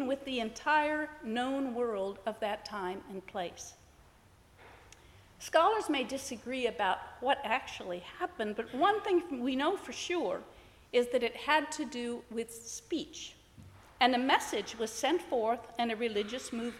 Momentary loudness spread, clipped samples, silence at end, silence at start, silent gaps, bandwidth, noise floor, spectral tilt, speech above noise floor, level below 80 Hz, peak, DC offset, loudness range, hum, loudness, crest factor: 12 LU; under 0.1%; 0 s; 0 s; none; 16 kHz; -61 dBFS; -3 dB/octave; 28 dB; -66 dBFS; -12 dBFS; under 0.1%; 5 LU; none; -33 LUFS; 22 dB